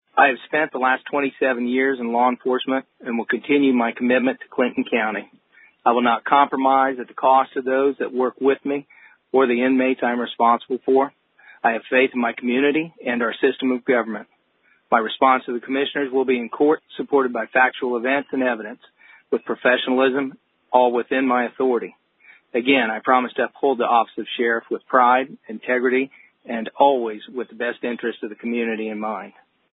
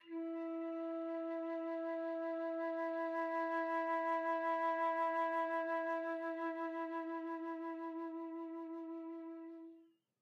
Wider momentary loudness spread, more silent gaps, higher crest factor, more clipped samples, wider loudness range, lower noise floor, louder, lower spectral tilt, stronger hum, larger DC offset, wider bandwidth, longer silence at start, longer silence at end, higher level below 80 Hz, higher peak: about the same, 10 LU vs 10 LU; neither; first, 20 dB vs 12 dB; neither; second, 2 LU vs 7 LU; about the same, -62 dBFS vs -65 dBFS; first, -20 LUFS vs -40 LUFS; first, -9 dB/octave vs -4 dB/octave; neither; neither; second, 4 kHz vs 6.6 kHz; about the same, 0.15 s vs 0.05 s; about the same, 0.4 s vs 0.35 s; first, -74 dBFS vs under -90 dBFS; first, 0 dBFS vs -28 dBFS